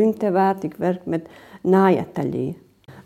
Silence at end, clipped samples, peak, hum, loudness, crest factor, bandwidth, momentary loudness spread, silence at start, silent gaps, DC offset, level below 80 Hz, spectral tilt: 0.05 s; under 0.1%; -6 dBFS; none; -21 LUFS; 16 dB; 13.5 kHz; 12 LU; 0 s; none; under 0.1%; -60 dBFS; -8.5 dB/octave